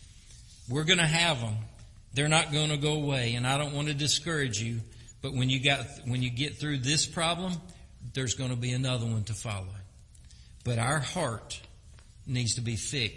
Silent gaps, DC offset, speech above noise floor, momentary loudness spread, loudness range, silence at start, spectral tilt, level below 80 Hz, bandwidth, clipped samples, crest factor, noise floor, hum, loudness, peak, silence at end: none; under 0.1%; 23 dB; 14 LU; 6 LU; 0 s; -3.5 dB/octave; -52 dBFS; 11.5 kHz; under 0.1%; 22 dB; -52 dBFS; none; -29 LUFS; -8 dBFS; 0 s